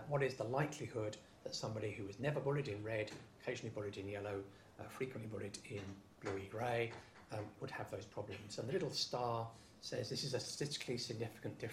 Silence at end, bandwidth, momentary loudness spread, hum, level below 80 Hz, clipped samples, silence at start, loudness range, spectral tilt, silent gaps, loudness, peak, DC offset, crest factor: 0 s; 15.5 kHz; 10 LU; none; -72 dBFS; under 0.1%; 0 s; 4 LU; -5 dB/octave; none; -44 LUFS; -24 dBFS; under 0.1%; 20 dB